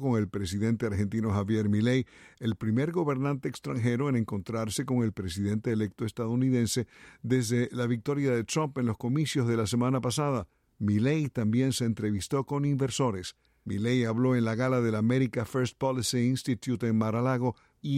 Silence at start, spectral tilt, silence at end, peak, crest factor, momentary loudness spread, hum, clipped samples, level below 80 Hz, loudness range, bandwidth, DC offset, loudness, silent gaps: 0 s; -6 dB/octave; 0 s; -16 dBFS; 14 dB; 7 LU; none; under 0.1%; -58 dBFS; 2 LU; 15 kHz; under 0.1%; -29 LUFS; none